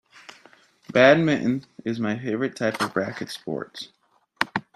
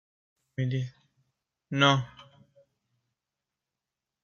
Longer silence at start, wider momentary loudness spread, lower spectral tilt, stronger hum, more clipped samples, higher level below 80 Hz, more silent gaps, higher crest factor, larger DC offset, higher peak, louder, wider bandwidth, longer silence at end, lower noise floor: first, 0.9 s vs 0.6 s; about the same, 17 LU vs 18 LU; about the same, -5.5 dB/octave vs -5.5 dB/octave; neither; neither; first, -64 dBFS vs -70 dBFS; neither; about the same, 24 dB vs 26 dB; neither; first, -2 dBFS vs -8 dBFS; first, -23 LUFS vs -27 LUFS; first, 13.5 kHz vs 7.2 kHz; second, 0.15 s vs 2 s; second, -55 dBFS vs -88 dBFS